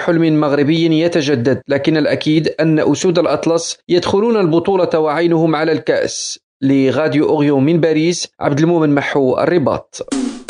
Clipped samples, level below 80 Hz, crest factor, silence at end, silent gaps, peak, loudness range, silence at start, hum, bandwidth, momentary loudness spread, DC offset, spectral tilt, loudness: under 0.1%; -52 dBFS; 14 dB; 0.05 s; 6.43-6.60 s; 0 dBFS; 1 LU; 0 s; none; 10 kHz; 5 LU; under 0.1%; -5.5 dB/octave; -14 LUFS